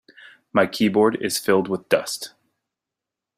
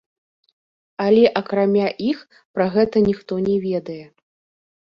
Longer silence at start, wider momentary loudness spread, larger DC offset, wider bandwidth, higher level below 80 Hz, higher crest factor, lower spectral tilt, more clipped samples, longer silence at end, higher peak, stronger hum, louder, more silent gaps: second, 0.55 s vs 1 s; second, 11 LU vs 15 LU; neither; first, 16 kHz vs 6.4 kHz; second, -64 dBFS vs -56 dBFS; about the same, 20 dB vs 18 dB; second, -4 dB/octave vs -8.5 dB/octave; neither; first, 1.1 s vs 0.85 s; about the same, -2 dBFS vs -4 dBFS; neither; about the same, -21 LUFS vs -19 LUFS; second, none vs 2.45-2.54 s